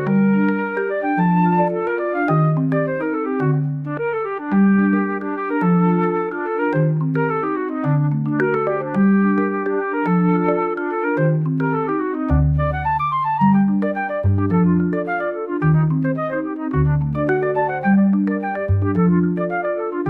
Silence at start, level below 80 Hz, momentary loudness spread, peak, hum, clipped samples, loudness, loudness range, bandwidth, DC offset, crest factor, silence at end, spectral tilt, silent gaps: 0 s; -38 dBFS; 6 LU; -4 dBFS; none; under 0.1%; -19 LUFS; 1 LU; 4.2 kHz; 0.1%; 14 dB; 0 s; -11 dB/octave; none